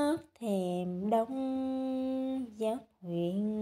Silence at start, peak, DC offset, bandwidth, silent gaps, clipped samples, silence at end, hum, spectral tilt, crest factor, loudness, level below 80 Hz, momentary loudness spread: 0 s; -18 dBFS; under 0.1%; 15 kHz; none; under 0.1%; 0 s; none; -7.5 dB/octave; 16 dB; -34 LUFS; -72 dBFS; 5 LU